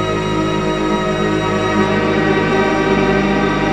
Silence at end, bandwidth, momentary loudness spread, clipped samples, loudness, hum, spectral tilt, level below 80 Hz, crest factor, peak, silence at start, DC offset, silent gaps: 0 s; 10.5 kHz; 3 LU; under 0.1%; -15 LUFS; none; -6 dB/octave; -34 dBFS; 12 dB; -2 dBFS; 0 s; under 0.1%; none